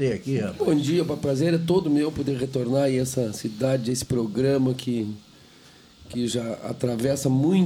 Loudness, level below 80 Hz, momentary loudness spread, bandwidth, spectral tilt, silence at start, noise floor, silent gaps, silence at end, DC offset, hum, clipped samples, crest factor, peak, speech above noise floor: -24 LUFS; -54 dBFS; 7 LU; 19 kHz; -6.5 dB/octave; 0 s; -51 dBFS; none; 0 s; under 0.1%; none; under 0.1%; 14 dB; -10 dBFS; 28 dB